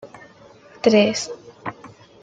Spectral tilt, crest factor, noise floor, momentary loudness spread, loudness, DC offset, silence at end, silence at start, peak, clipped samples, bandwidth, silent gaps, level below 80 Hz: -4.5 dB/octave; 20 dB; -47 dBFS; 18 LU; -19 LUFS; under 0.1%; 0.35 s; 0.05 s; -2 dBFS; under 0.1%; 9.4 kHz; none; -64 dBFS